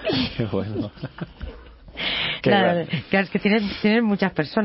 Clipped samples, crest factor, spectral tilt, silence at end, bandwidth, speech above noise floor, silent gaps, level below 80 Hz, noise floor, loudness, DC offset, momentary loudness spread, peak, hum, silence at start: under 0.1%; 18 dB; -10.5 dB/octave; 0 s; 5.8 kHz; 20 dB; none; -44 dBFS; -41 dBFS; -22 LUFS; under 0.1%; 17 LU; -4 dBFS; none; 0 s